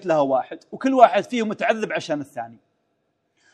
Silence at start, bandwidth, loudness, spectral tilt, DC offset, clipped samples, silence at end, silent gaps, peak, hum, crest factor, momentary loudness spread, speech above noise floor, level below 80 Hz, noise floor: 0 s; 9.8 kHz; -21 LUFS; -5 dB/octave; under 0.1%; under 0.1%; 1 s; none; 0 dBFS; none; 22 dB; 19 LU; 51 dB; -76 dBFS; -72 dBFS